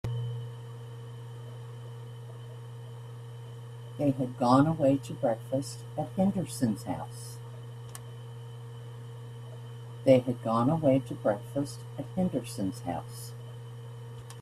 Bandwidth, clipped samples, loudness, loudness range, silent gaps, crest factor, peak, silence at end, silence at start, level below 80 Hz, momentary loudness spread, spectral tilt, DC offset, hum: 14.5 kHz; under 0.1%; -30 LUFS; 13 LU; none; 24 dB; -8 dBFS; 0 s; 0.05 s; -62 dBFS; 19 LU; -7.5 dB/octave; under 0.1%; none